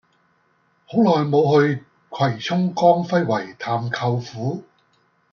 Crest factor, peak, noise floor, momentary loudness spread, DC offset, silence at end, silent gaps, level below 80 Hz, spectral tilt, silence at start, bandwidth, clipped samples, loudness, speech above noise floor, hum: 18 dB; -2 dBFS; -63 dBFS; 11 LU; under 0.1%; 0.7 s; none; -66 dBFS; -7 dB/octave; 0.9 s; 7 kHz; under 0.1%; -20 LUFS; 44 dB; none